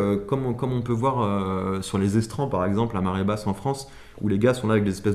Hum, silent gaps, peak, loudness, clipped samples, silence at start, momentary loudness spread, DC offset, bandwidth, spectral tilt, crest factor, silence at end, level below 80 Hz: none; none; -8 dBFS; -25 LUFS; under 0.1%; 0 s; 6 LU; under 0.1%; 13.5 kHz; -7 dB/octave; 16 dB; 0 s; -48 dBFS